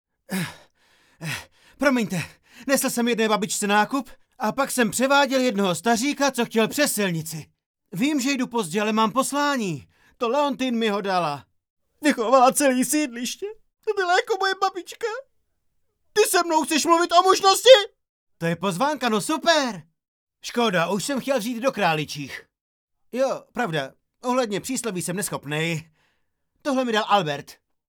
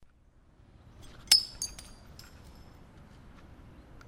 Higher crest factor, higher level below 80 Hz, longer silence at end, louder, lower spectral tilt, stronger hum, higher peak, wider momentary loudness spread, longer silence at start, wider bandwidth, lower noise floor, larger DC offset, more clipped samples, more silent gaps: second, 22 dB vs 34 dB; second, -66 dBFS vs -56 dBFS; second, 0.35 s vs 0.55 s; first, -22 LUFS vs -26 LUFS; first, -3.5 dB/octave vs 0.5 dB/octave; neither; about the same, 0 dBFS vs -2 dBFS; second, 15 LU vs 28 LU; second, 0.3 s vs 1.25 s; first, over 20 kHz vs 16 kHz; first, -71 dBFS vs -61 dBFS; neither; neither; first, 7.66-7.74 s, 11.70-11.77 s, 18.09-18.27 s, 20.08-20.27 s, 22.61-22.88 s vs none